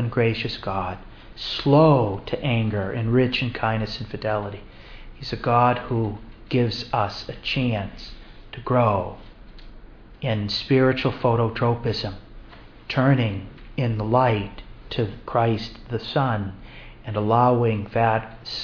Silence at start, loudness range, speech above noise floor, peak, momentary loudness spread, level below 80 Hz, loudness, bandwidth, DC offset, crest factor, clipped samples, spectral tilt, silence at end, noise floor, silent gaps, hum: 0 s; 4 LU; 22 dB; -4 dBFS; 16 LU; -44 dBFS; -23 LUFS; 5.4 kHz; under 0.1%; 20 dB; under 0.1%; -8 dB/octave; 0 s; -44 dBFS; none; none